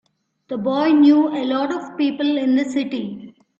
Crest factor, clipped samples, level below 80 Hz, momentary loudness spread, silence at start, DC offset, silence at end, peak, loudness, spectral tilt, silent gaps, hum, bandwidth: 14 dB; under 0.1%; -66 dBFS; 15 LU; 0.5 s; under 0.1%; 0.3 s; -4 dBFS; -18 LUFS; -6 dB/octave; none; none; 7.8 kHz